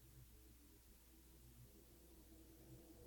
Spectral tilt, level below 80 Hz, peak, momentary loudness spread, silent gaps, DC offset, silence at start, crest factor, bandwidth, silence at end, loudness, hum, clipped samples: -5 dB/octave; -68 dBFS; -50 dBFS; 3 LU; none; under 0.1%; 0 s; 14 dB; 19 kHz; 0 s; -65 LUFS; none; under 0.1%